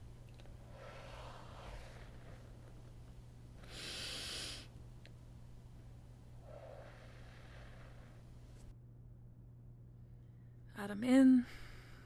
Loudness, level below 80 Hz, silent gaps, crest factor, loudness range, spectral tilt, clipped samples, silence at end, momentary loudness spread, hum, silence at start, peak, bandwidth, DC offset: -35 LUFS; -58 dBFS; none; 22 dB; 21 LU; -5.5 dB/octave; under 0.1%; 0 s; 19 LU; 60 Hz at -60 dBFS; 0 s; -20 dBFS; 13.5 kHz; under 0.1%